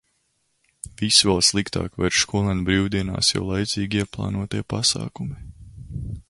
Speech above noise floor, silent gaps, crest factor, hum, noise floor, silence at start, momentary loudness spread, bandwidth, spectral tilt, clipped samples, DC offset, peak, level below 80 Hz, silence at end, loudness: 47 dB; none; 22 dB; none; -70 dBFS; 0.85 s; 17 LU; 11.5 kHz; -3.5 dB/octave; under 0.1%; under 0.1%; -2 dBFS; -42 dBFS; 0.1 s; -21 LUFS